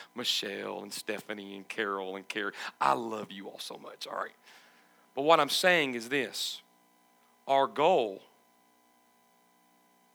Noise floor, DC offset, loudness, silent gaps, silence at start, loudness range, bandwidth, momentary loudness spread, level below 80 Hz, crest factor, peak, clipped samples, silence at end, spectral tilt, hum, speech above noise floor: -66 dBFS; under 0.1%; -30 LUFS; none; 0 s; 7 LU; over 20 kHz; 17 LU; under -90 dBFS; 24 dB; -8 dBFS; under 0.1%; 1.95 s; -2.5 dB/octave; 60 Hz at -70 dBFS; 35 dB